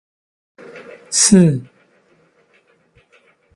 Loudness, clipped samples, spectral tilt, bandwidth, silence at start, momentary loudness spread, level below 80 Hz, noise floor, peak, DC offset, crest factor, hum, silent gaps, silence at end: -13 LUFS; under 0.1%; -4.5 dB/octave; 11.5 kHz; 0.75 s; 28 LU; -54 dBFS; -57 dBFS; 0 dBFS; under 0.1%; 20 dB; none; none; 1.95 s